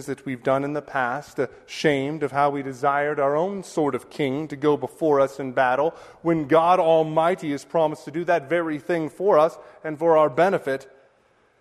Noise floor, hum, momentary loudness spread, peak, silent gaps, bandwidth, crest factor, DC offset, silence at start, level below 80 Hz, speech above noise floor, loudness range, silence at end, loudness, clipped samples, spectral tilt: -61 dBFS; none; 9 LU; -4 dBFS; none; 13.5 kHz; 18 dB; under 0.1%; 0 s; -64 dBFS; 39 dB; 3 LU; 0.75 s; -23 LUFS; under 0.1%; -6 dB/octave